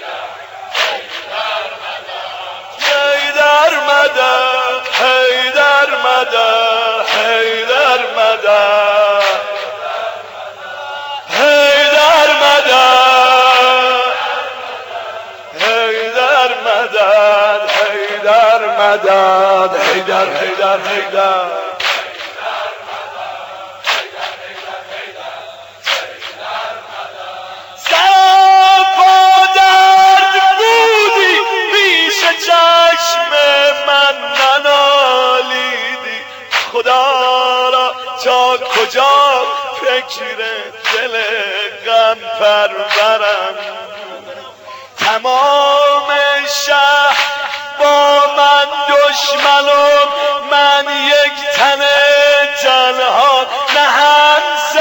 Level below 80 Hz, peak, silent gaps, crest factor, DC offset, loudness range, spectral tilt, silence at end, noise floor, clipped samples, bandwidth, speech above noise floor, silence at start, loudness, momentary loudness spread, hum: -60 dBFS; 0 dBFS; none; 12 dB; under 0.1%; 9 LU; -0.5 dB/octave; 0 s; -33 dBFS; under 0.1%; 17 kHz; 21 dB; 0 s; -10 LUFS; 17 LU; none